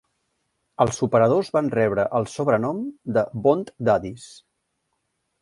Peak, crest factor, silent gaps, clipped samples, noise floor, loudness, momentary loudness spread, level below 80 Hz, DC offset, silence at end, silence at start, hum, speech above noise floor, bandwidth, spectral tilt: -2 dBFS; 20 dB; none; under 0.1%; -75 dBFS; -22 LUFS; 7 LU; -56 dBFS; under 0.1%; 1.1 s; 0.8 s; none; 53 dB; 11.5 kHz; -6.5 dB/octave